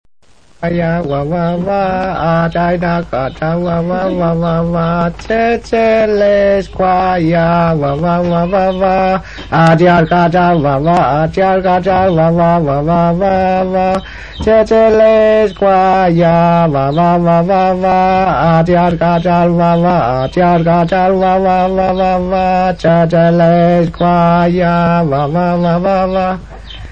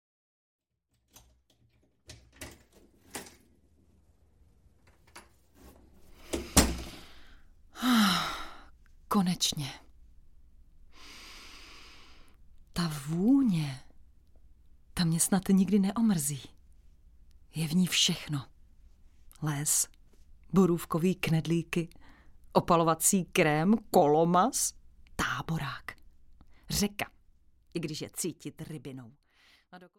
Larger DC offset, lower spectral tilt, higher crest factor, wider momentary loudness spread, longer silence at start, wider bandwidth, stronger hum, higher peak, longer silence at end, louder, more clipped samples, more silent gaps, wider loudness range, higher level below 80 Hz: first, 0.7% vs under 0.1%; first, -8.5 dB/octave vs -4 dB/octave; second, 10 dB vs 26 dB; second, 6 LU vs 22 LU; second, 0.6 s vs 2.1 s; second, 7.2 kHz vs 16.5 kHz; neither; first, 0 dBFS vs -6 dBFS; second, 0 s vs 0.2 s; first, -11 LUFS vs -29 LUFS; neither; neither; second, 4 LU vs 20 LU; first, -32 dBFS vs -50 dBFS